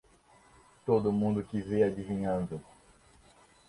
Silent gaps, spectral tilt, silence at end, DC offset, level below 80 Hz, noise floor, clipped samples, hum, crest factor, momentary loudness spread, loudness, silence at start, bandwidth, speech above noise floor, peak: none; -8.5 dB/octave; 1.05 s; under 0.1%; -58 dBFS; -62 dBFS; under 0.1%; none; 20 dB; 12 LU; -31 LUFS; 0.85 s; 11.5 kHz; 32 dB; -14 dBFS